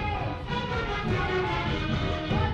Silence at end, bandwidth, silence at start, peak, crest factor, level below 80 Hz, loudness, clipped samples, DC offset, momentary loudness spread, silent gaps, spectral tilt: 0 s; 8.6 kHz; 0 s; -14 dBFS; 14 dB; -38 dBFS; -29 LUFS; under 0.1%; under 0.1%; 4 LU; none; -6.5 dB/octave